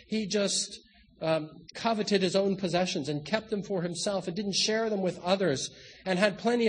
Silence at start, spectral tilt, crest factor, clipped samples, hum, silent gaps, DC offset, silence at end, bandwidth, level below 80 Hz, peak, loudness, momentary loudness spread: 0.1 s; -4 dB/octave; 22 dB; under 0.1%; none; none; under 0.1%; 0 s; 10 kHz; -66 dBFS; -8 dBFS; -29 LUFS; 7 LU